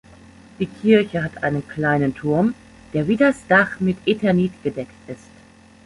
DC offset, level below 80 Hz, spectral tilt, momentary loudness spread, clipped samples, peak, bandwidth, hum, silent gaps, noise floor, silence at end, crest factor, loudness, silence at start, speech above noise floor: under 0.1%; -52 dBFS; -7.5 dB/octave; 16 LU; under 0.1%; -2 dBFS; 11.5 kHz; none; none; -48 dBFS; 0.7 s; 18 dB; -20 LUFS; 0.6 s; 29 dB